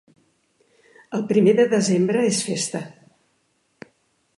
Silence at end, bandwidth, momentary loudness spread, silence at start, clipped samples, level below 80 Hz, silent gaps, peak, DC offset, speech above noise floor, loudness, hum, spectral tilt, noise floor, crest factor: 1.5 s; 11.5 kHz; 14 LU; 1.1 s; under 0.1%; -70 dBFS; none; -6 dBFS; under 0.1%; 48 dB; -20 LUFS; none; -5 dB/octave; -67 dBFS; 18 dB